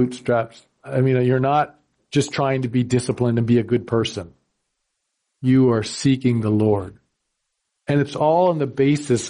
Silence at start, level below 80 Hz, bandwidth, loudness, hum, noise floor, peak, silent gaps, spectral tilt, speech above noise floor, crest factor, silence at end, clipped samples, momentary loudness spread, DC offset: 0 s; -56 dBFS; 11 kHz; -20 LUFS; none; -76 dBFS; -6 dBFS; none; -6.5 dB/octave; 57 dB; 14 dB; 0 s; under 0.1%; 9 LU; under 0.1%